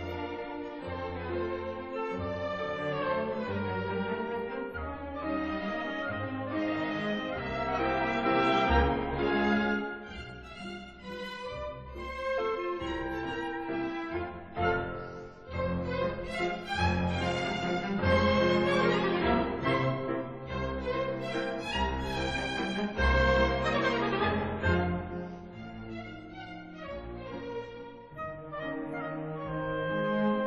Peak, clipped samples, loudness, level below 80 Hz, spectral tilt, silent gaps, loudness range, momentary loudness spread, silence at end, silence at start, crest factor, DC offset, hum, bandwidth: -12 dBFS; under 0.1%; -32 LUFS; -44 dBFS; -6.5 dB/octave; none; 8 LU; 15 LU; 0 s; 0 s; 20 dB; under 0.1%; none; 9.4 kHz